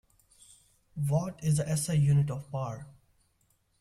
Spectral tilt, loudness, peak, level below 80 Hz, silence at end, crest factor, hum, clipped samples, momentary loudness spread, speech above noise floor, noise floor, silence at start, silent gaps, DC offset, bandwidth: -6.5 dB/octave; -30 LUFS; -16 dBFS; -58 dBFS; 0.9 s; 16 dB; none; under 0.1%; 13 LU; 43 dB; -71 dBFS; 0.95 s; none; under 0.1%; 14 kHz